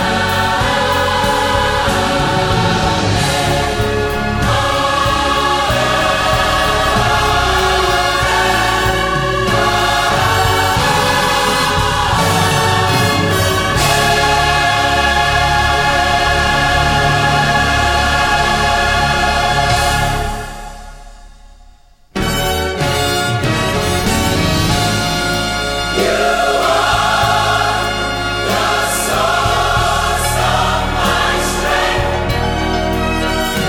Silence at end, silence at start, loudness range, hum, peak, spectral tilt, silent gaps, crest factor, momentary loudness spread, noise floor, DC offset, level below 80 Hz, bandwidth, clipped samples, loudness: 0 s; 0 s; 3 LU; none; 0 dBFS; -3.5 dB/octave; none; 14 dB; 4 LU; -44 dBFS; under 0.1%; -26 dBFS; 17.5 kHz; under 0.1%; -13 LUFS